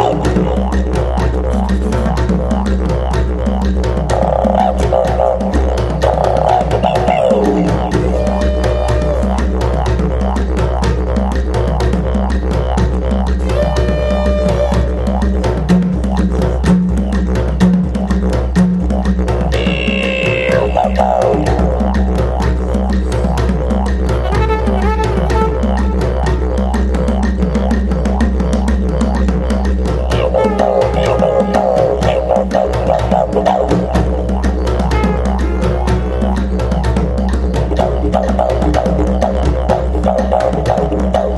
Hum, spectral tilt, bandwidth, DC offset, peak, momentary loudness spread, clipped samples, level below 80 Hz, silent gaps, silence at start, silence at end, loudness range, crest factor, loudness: none; -7.5 dB/octave; 11 kHz; under 0.1%; 0 dBFS; 3 LU; under 0.1%; -16 dBFS; none; 0 s; 0 s; 2 LU; 12 dB; -14 LUFS